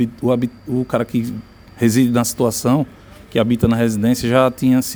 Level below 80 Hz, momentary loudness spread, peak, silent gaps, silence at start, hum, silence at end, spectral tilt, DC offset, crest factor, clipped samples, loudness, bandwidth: -44 dBFS; 8 LU; 0 dBFS; none; 0 s; none; 0 s; -6 dB/octave; under 0.1%; 16 dB; under 0.1%; -18 LUFS; over 20 kHz